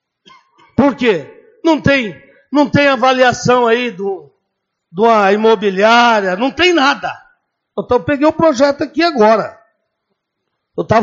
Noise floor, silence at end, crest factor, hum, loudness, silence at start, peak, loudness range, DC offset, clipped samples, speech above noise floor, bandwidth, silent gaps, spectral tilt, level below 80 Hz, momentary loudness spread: -73 dBFS; 0 s; 14 dB; none; -13 LUFS; 0.8 s; 0 dBFS; 3 LU; under 0.1%; under 0.1%; 60 dB; 7.8 kHz; none; -3 dB/octave; -48 dBFS; 15 LU